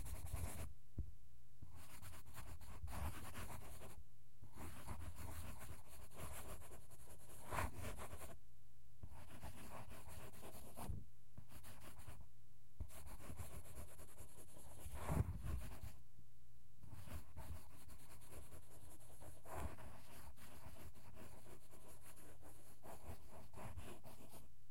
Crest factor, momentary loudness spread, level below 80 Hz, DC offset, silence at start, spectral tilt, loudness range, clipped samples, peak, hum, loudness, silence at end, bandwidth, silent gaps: 28 dB; 13 LU; -60 dBFS; 0.6%; 0 s; -5 dB/octave; 9 LU; under 0.1%; -26 dBFS; none; -55 LUFS; 0 s; 16.5 kHz; none